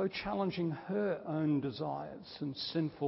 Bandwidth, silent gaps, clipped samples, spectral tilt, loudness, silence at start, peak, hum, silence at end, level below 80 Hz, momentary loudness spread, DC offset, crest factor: 5.8 kHz; none; under 0.1%; -10 dB/octave; -36 LUFS; 0 s; -22 dBFS; none; 0 s; -66 dBFS; 9 LU; under 0.1%; 14 dB